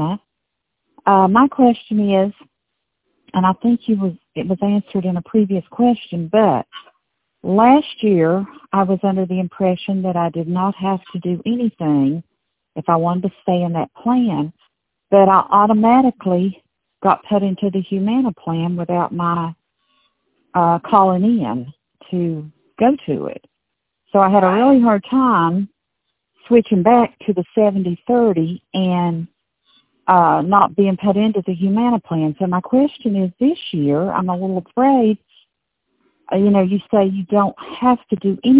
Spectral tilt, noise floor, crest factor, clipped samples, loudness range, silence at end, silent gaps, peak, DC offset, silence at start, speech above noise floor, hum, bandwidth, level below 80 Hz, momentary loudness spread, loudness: -11.5 dB/octave; -77 dBFS; 16 dB; under 0.1%; 4 LU; 0 s; none; 0 dBFS; under 0.1%; 0 s; 61 dB; none; 4 kHz; -56 dBFS; 10 LU; -17 LUFS